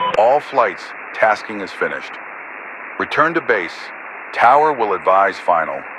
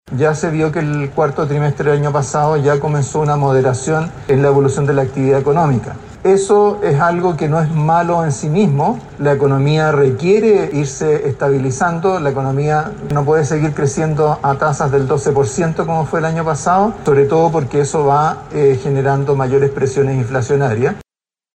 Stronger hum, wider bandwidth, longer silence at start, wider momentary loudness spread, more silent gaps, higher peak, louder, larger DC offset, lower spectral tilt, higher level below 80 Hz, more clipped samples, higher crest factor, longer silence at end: neither; about the same, 11 kHz vs 10 kHz; about the same, 0 s vs 0.05 s; first, 17 LU vs 5 LU; neither; about the same, 0 dBFS vs -2 dBFS; about the same, -16 LUFS vs -15 LUFS; neither; second, -4.5 dB/octave vs -7 dB/octave; second, -62 dBFS vs -44 dBFS; neither; first, 18 dB vs 12 dB; second, 0 s vs 0.55 s